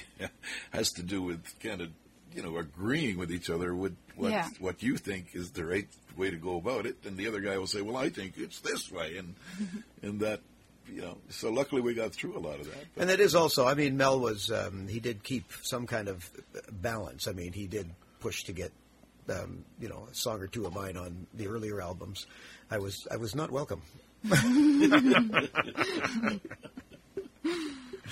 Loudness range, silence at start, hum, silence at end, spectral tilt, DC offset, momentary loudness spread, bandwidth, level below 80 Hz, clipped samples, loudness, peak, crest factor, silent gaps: 12 LU; 0 s; none; 0 s; -4.5 dB/octave; under 0.1%; 19 LU; 16 kHz; -60 dBFS; under 0.1%; -32 LUFS; -6 dBFS; 26 dB; none